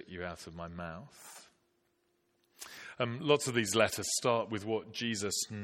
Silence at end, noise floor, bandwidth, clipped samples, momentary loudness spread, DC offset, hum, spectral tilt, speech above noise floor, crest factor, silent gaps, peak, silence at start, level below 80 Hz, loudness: 0 s; -76 dBFS; 16.5 kHz; under 0.1%; 21 LU; under 0.1%; none; -3.5 dB/octave; 42 dB; 24 dB; none; -12 dBFS; 0 s; -68 dBFS; -33 LUFS